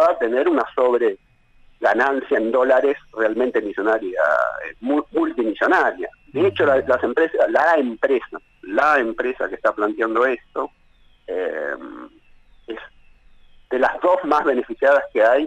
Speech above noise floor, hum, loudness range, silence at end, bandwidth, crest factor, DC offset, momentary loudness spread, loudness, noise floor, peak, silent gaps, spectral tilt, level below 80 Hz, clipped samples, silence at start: 33 dB; none; 7 LU; 0 s; 8.8 kHz; 14 dB; under 0.1%; 12 LU; -19 LUFS; -52 dBFS; -6 dBFS; none; -6 dB/octave; -54 dBFS; under 0.1%; 0 s